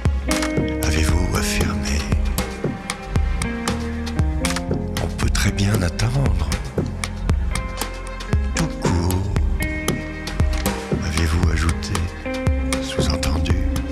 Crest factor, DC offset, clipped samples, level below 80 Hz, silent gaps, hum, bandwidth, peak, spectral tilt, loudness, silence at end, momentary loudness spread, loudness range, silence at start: 16 dB; under 0.1%; under 0.1%; -24 dBFS; none; none; 15 kHz; -4 dBFS; -5 dB/octave; -22 LUFS; 0 s; 6 LU; 2 LU; 0 s